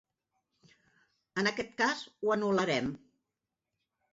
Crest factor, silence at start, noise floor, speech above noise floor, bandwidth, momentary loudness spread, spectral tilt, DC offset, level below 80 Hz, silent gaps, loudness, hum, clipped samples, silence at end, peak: 18 dB; 1.35 s; -88 dBFS; 57 dB; 7.6 kHz; 10 LU; -3 dB/octave; under 0.1%; -70 dBFS; none; -32 LUFS; none; under 0.1%; 1.15 s; -18 dBFS